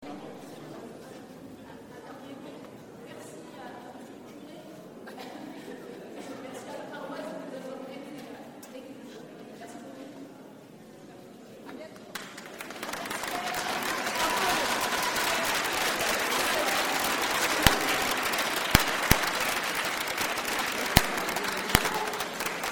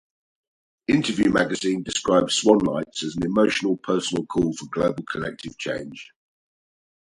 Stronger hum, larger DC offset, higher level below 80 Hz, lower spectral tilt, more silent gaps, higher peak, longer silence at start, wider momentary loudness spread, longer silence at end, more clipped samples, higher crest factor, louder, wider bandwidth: neither; neither; first, -46 dBFS vs -52 dBFS; second, -2.5 dB/octave vs -4.5 dB/octave; neither; about the same, 0 dBFS vs -2 dBFS; second, 0 s vs 0.9 s; first, 22 LU vs 12 LU; second, 0 s vs 1.15 s; neither; first, 32 dB vs 22 dB; second, -27 LUFS vs -23 LUFS; first, 18 kHz vs 11.5 kHz